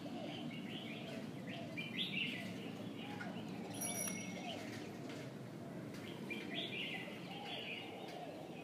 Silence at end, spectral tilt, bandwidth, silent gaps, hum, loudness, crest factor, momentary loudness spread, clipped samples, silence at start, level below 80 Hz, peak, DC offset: 0 s; -3.5 dB/octave; 15.5 kHz; none; none; -45 LUFS; 20 dB; 9 LU; under 0.1%; 0 s; -82 dBFS; -26 dBFS; under 0.1%